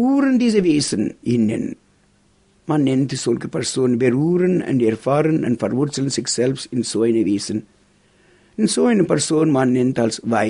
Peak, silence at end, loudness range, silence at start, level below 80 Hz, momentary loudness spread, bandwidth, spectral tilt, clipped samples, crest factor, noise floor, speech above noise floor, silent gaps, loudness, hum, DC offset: -4 dBFS; 0 s; 3 LU; 0 s; -58 dBFS; 7 LU; 11 kHz; -5.5 dB/octave; under 0.1%; 16 dB; -57 dBFS; 40 dB; none; -19 LUFS; none; under 0.1%